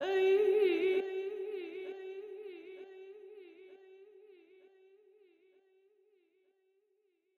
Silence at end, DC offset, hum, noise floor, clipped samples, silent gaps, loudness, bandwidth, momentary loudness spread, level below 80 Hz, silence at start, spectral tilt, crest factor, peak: 3.35 s; under 0.1%; none; -78 dBFS; under 0.1%; none; -33 LUFS; 6.8 kHz; 26 LU; -88 dBFS; 0 s; -4.5 dB/octave; 18 dB; -20 dBFS